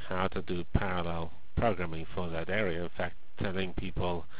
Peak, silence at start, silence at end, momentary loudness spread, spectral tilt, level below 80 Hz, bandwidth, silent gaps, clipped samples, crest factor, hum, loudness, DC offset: -10 dBFS; 0 s; 0 s; 7 LU; -5 dB/octave; -44 dBFS; 4 kHz; none; under 0.1%; 24 dB; none; -34 LUFS; 3%